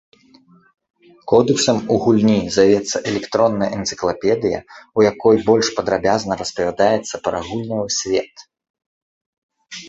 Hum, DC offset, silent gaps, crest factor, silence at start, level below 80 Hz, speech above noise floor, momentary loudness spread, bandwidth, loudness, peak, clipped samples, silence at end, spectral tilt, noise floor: none; under 0.1%; 8.70-8.74 s, 8.86-9.49 s; 18 dB; 1.25 s; -50 dBFS; 34 dB; 9 LU; 8.2 kHz; -18 LUFS; 0 dBFS; under 0.1%; 0 s; -4.5 dB/octave; -51 dBFS